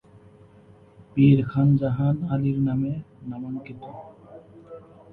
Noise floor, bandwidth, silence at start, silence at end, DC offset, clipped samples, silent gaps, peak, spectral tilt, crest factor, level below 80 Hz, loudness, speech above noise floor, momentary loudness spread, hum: -52 dBFS; 4.1 kHz; 1.15 s; 0.35 s; under 0.1%; under 0.1%; none; -6 dBFS; -11.5 dB/octave; 18 dB; -54 dBFS; -23 LUFS; 30 dB; 27 LU; none